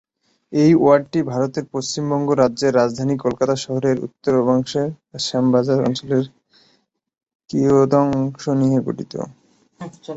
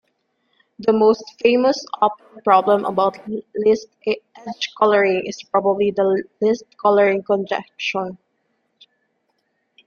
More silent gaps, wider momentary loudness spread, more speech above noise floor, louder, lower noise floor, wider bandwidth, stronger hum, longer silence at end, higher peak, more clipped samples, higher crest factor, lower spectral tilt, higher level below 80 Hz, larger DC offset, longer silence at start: first, 7.35-7.39 s vs none; about the same, 12 LU vs 11 LU; second, 45 dB vs 51 dB; about the same, -19 LUFS vs -19 LUFS; second, -63 dBFS vs -70 dBFS; first, 8 kHz vs 7 kHz; neither; second, 0 s vs 1.7 s; about the same, -2 dBFS vs -2 dBFS; neither; about the same, 18 dB vs 18 dB; first, -6.5 dB/octave vs -5 dB/octave; first, -56 dBFS vs -66 dBFS; neither; second, 0.5 s vs 0.8 s